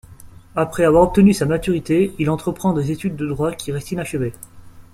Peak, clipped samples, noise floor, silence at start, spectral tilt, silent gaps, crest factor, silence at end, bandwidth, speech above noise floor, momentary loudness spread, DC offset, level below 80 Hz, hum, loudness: -2 dBFS; under 0.1%; -41 dBFS; 0.1 s; -7 dB/octave; none; 16 dB; 0.15 s; 15 kHz; 23 dB; 12 LU; under 0.1%; -40 dBFS; none; -19 LUFS